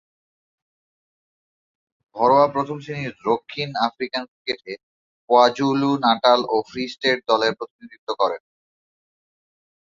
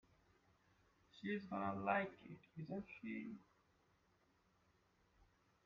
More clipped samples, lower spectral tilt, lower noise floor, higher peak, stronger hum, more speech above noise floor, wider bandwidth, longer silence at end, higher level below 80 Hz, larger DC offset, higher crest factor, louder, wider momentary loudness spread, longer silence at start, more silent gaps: neither; about the same, -5 dB/octave vs -5 dB/octave; first, under -90 dBFS vs -78 dBFS; first, -2 dBFS vs -26 dBFS; neither; first, over 69 dB vs 32 dB; about the same, 7.6 kHz vs 7 kHz; second, 1.6 s vs 2.25 s; first, -66 dBFS vs -82 dBFS; neither; about the same, 20 dB vs 24 dB; first, -21 LUFS vs -46 LUFS; about the same, 17 LU vs 16 LU; first, 2.15 s vs 1.15 s; first, 4.28-4.45 s, 4.83-5.28 s, 7.70-7.79 s, 7.98-8.07 s vs none